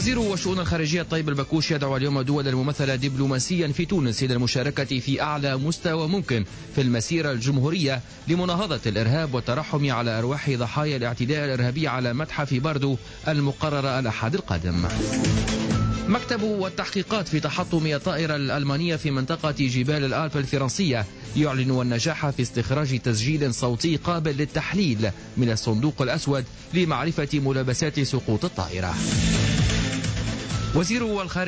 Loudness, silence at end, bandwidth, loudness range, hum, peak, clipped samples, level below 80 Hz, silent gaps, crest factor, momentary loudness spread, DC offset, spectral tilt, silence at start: -24 LUFS; 0 s; 8 kHz; 1 LU; none; -12 dBFS; under 0.1%; -40 dBFS; none; 12 dB; 3 LU; under 0.1%; -5.5 dB/octave; 0 s